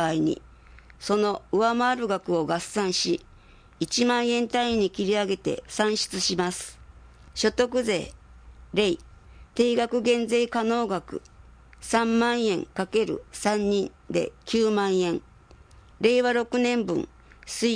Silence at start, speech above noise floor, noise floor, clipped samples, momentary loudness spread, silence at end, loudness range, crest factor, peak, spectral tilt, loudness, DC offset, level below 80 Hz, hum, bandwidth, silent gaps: 0 s; 27 dB; -52 dBFS; under 0.1%; 9 LU; 0 s; 2 LU; 18 dB; -8 dBFS; -4 dB/octave; -25 LUFS; under 0.1%; -54 dBFS; none; 10.5 kHz; none